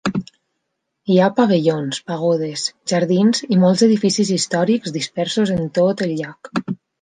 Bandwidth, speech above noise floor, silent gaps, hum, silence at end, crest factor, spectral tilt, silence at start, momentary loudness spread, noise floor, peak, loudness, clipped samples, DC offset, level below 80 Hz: 9.8 kHz; 58 dB; none; none; 0.25 s; 16 dB; -5.5 dB/octave; 0.05 s; 11 LU; -75 dBFS; -2 dBFS; -18 LUFS; under 0.1%; under 0.1%; -58 dBFS